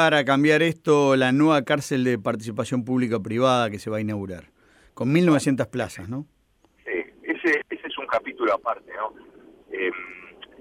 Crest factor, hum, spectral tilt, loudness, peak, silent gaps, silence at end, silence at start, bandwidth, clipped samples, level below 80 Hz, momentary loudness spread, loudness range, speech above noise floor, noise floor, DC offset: 18 dB; none; -6 dB/octave; -23 LUFS; -6 dBFS; none; 0.3 s; 0 s; 15.5 kHz; under 0.1%; -62 dBFS; 15 LU; 6 LU; 40 dB; -62 dBFS; under 0.1%